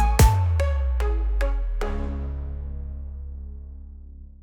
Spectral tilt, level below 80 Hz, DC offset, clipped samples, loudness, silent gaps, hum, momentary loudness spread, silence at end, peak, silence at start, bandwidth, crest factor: -5.5 dB/octave; -26 dBFS; under 0.1%; under 0.1%; -25 LUFS; none; none; 23 LU; 0.15 s; -6 dBFS; 0 s; 18 kHz; 18 dB